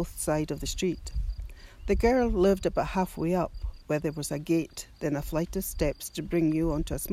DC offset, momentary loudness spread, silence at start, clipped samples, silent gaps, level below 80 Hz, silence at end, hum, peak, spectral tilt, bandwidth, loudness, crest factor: under 0.1%; 12 LU; 0 s; under 0.1%; none; -38 dBFS; 0 s; none; -12 dBFS; -5.5 dB/octave; 16 kHz; -29 LUFS; 16 dB